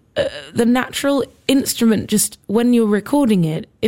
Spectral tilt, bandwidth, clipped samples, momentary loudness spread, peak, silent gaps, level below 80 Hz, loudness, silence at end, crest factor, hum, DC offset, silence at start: -4.5 dB/octave; 16.5 kHz; under 0.1%; 6 LU; -2 dBFS; none; -50 dBFS; -17 LUFS; 0 s; 16 dB; none; under 0.1%; 0.15 s